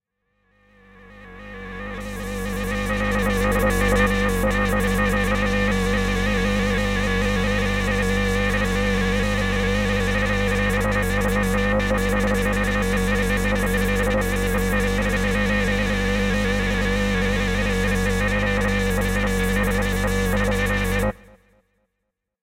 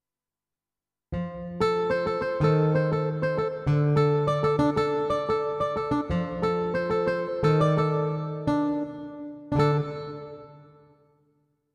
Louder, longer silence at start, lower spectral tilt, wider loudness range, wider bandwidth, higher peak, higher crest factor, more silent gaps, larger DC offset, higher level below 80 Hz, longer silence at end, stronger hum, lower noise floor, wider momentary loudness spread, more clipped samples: first, -21 LUFS vs -26 LUFS; about the same, 1.05 s vs 1.1 s; second, -5.5 dB/octave vs -8.5 dB/octave; about the same, 2 LU vs 4 LU; first, 16.5 kHz vs 9.4 kHz; about the same, -8 dBFS vs -10 dBFS; about the same, 14 dB vs 16 dB; neither; neither; first, -28 dBFS vs -50 dBFS; first, 1.3 s vs 1.1 s; neither; second, -79 dBFS vs under -90 dBFS; second, 2 LU vs 13 LU; neither